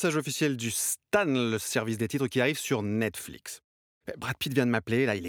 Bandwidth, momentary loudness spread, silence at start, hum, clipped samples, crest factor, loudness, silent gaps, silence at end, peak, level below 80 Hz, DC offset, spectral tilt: over 20 kHz; 14 LU; 0 s; none; under 0.1%; 18 dB; -28 LUFS; 3.64-4.01 s; 0 s; -10 dBFS; -66 dBFS; under 0.1%; -4.5 dB/octave